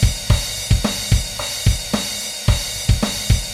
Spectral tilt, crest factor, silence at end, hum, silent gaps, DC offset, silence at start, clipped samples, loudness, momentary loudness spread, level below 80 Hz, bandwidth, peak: -4 dB/octave; 16 dB; 0 s; none; none; under 0.1%; 0 s; under 0.1%; -19 LUFS; 3 LU; -22 dBFS; 16 kHz; -2 dBFS